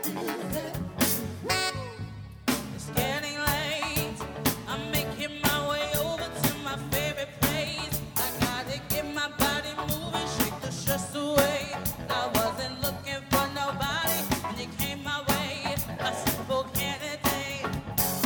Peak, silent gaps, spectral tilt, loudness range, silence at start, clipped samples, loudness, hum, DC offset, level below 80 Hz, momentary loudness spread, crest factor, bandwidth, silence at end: -6 dBFS; none; -3.5 dB/octave; 1 LU; 0 s; under 0.1%; -29 LUFS; none; under 0.1%; -46 dBFS; 6 LU; 24 dB; over 20 kHz; 0 s